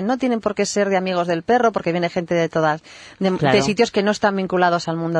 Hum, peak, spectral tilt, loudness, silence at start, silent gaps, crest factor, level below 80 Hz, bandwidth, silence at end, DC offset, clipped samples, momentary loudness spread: none; -4 dBFS; -5 dB/octave; -19 LUFS; 0 s; none; 16 dB; -56 dBFS; 10.5 kHz; 0 s; under 0.1%; under 0.1%; 5 LU